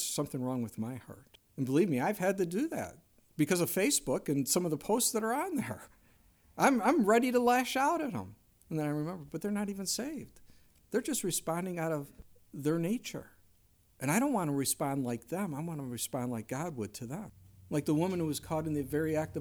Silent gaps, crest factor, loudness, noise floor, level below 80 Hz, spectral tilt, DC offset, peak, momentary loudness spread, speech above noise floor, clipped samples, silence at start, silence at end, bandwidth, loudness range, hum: none; 20 dB; -33 LUFS; -66 dBFS; -66 dBFS; -4.5 dB/octave; under 0.1%; -12 dBFS; 14 LU; 34 dB; under 0.1%; 0 s; 0 s; over 20 kHz; 6 LU; none